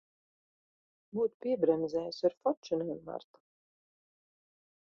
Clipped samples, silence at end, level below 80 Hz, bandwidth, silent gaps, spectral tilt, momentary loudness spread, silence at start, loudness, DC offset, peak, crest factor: under 0.1%; 1.65 s; -76 dBFS; 6.8 kHz; 1.34-1.40 s, 2.37-2.41 s, 2.57-2.63 s; -7 dB/octave; 12 LU; 1.15 s; -33 LUFS; under 0.1%; -16 dBFS; 20 dB